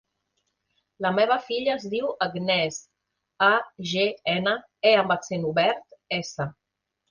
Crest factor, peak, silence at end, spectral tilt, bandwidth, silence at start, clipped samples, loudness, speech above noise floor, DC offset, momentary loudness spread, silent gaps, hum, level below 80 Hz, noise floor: 20 dB; -6 dBFS; 0.6 s; -4 dB/octave; 10 kHz; 1 s; under 0.1%; -24 LUFS; 56 dB; under 0.1%; 10 LU; none; none; -66 dBFS; -80 dBFS